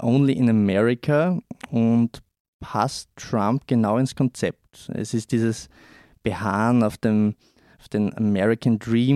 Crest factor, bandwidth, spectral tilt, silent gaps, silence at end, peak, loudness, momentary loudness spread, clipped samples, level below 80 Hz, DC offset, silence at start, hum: 14 dB; 12.5 kHz; -7 dB/octave; 2.40-2.59 s; 0 s; -8 dBFS; -22 LUFS; 10 LU; under 0.1%; -56 dBFS; under 0.1%; 0 s; none